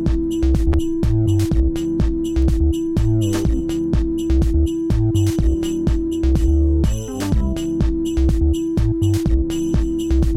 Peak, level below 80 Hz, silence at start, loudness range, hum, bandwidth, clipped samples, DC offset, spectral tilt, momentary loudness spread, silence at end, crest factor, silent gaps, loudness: -6 dBFS; -20 dBFS; 0 s; 1 LU; none; 14 kHz; under 0.1%; under 0.1%; -7.5 dB/octave; 3 LU; 0 s; 12 dB; none; -19 LUFS